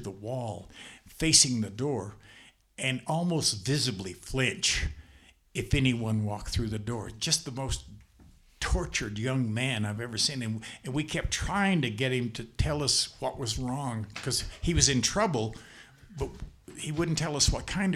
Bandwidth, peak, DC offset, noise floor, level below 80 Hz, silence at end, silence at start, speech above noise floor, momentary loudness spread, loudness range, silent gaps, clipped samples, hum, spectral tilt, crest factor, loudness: 15.5 kHz; -4 dBFS; under 0.1%; -58 dBFS; -42 dBFS; 0 s; 0 s; 28 dB; 13 LU; 4 LU; none; under 0.1%; none; -3.5 dB/octave; 26 dB; -29 LUFS